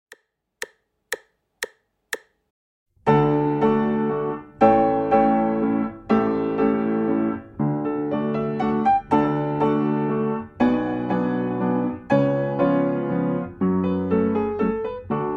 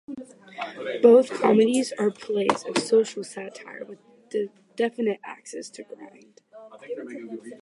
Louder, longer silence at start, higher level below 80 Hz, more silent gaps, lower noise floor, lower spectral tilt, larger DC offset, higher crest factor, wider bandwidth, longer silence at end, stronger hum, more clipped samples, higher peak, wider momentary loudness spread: about the same, -22 LUFS vs -23 LUFS; first, 0.6 s vs 0.1 s; first, -52 dBFS vs -76 dBFS; first, 2.50-2.86 s vs none; first, -53 dBFS vs -48 dBFS; first, -8 dB/octave vs -4.5 dB/octave; neither; about the same, 18 dB vs 22 dB; first, 15.5 kHz vs 11.5 kHz; about the same, 0 s vs 0.05 s; neither; neither; about the same, -4 dBFS vs -4 dBFS; second, 14 LU vs 22 LU